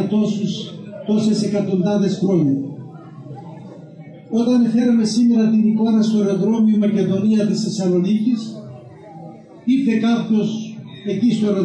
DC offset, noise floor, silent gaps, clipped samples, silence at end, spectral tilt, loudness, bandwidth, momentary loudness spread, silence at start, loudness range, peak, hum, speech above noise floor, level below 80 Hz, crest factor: under 0.1%; -38 dBFS; none; under 0.1%; 0 s; -7 dB/octave; -18 LUFS; 9.6 kHz; 21 LU; 0 s; 5 LU; -6 dBFS; none; 22 dB; -64 dBFS; 12 dB